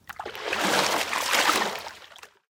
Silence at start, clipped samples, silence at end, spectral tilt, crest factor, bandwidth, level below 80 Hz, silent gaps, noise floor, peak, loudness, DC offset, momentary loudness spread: 0.1 s; under 0.1%; 0.25 s; -1 dB/octave; 20 dB; 18 kHz; -66 dBFS; none; -49 dBFS; -8 dBFS; -24 LUFS; under 0.1%; 17 LU